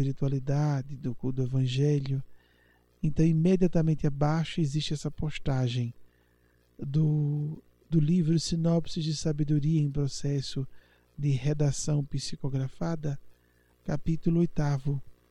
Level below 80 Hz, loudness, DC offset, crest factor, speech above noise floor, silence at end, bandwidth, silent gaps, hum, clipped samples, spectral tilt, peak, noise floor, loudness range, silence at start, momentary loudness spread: -46 dBFS; -29 LUFS; under 0.1%; 16 dB; 38 dB; 0.2 s; 10.5 kHz; none; 60 Hz at -55 dBFS; under 0.1%; -7 dB/octave; -12 dBFS; -65 dBFS; 4 LU; 0 s; 10 LU